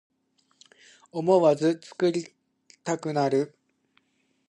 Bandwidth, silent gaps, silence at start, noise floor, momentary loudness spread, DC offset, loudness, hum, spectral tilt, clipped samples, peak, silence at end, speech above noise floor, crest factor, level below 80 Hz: 10.5 kHz; none; 1.15 s; -71 dBFS; 16 LU; under 0.1%; -25 LUFS; none; -6 dB/octave; under 0.1%; -8 dBFS; 1 s; 47 dB; 20 dB; -78 dBFS